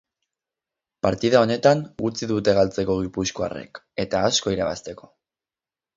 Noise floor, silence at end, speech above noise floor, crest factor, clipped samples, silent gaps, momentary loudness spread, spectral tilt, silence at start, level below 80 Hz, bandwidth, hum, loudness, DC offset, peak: under -90 dBFS; 1 s; over 68 dB; 22 dB; under 0.1%; none; 12 LU; -4.5 dB/octave; 1.05 s; -50 dBFS; 7.8 kHz; none; -22 LUFS; under 0.1%; -2 dBFS